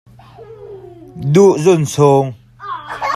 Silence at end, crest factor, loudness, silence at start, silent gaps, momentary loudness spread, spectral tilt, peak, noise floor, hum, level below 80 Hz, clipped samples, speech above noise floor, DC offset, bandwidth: 0 s; 14 dB; -13 LUFS; 0.4 s; none; 24 LU; -6.5 dB/octave; 0 dBFS; -38 dBFS; none; -52 dBFS; under 0.1%; 27 dB; under 0.1%; 13.5 kHz